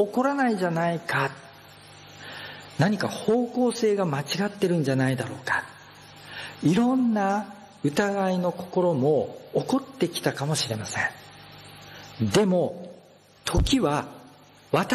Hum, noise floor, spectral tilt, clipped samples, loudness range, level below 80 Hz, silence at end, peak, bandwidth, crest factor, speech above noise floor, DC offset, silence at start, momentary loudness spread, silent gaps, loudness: none; -53 dBFS; -5.5 dB/octave; under 0.1%; 3 LU; -44 dBFS; 0 s; -8 dBFS; 13 kHz; 18 dB; 29 dB; under 0.1%; 0 s; 21 LU; none; -25 LUFS